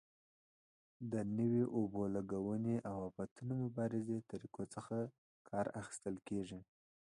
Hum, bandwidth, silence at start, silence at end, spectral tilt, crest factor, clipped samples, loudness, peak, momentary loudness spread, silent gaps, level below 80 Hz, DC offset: none; 11 kHz; 1 s; 0.5 s; -8 dB/octave; 16 dB; under 0.1%; -42 LUFS; -26 dBFS; 11 LU; 3.31-3.36 s, 5.18-5.45 s; -72 dBFS; under 0.1%